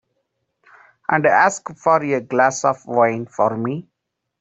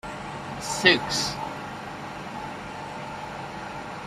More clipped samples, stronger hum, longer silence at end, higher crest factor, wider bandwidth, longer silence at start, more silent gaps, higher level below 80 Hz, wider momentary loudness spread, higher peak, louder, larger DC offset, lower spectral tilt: neither; second, none vs 50 Hz at -55 dBFS; first, 0.6 s vs 0 s; second, 18 dB vs 26 dB; second, 8.2 kHz vs 15.5 kHz; first, 1.1 s vs 0.05 s; neither; second, -66 dBFS vs -54 dBFS; second, 10 LU vs 16 LU; about the same, -2 dBFS vs -4 dBFS; first, -18 LUFS vs -28 LUFS; neither; first, -5 dB/octave vs -3 dB/octave